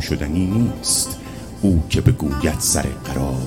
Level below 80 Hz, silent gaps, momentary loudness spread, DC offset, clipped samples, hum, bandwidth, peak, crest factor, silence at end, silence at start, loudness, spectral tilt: -30 dBFS; none; 7 LU; 0.3%; under 0.1%; none; 17 kHz; 0 dBFS; 18 dB; 0 s; 0 s; -19 LUFS; -4.5 dB/octave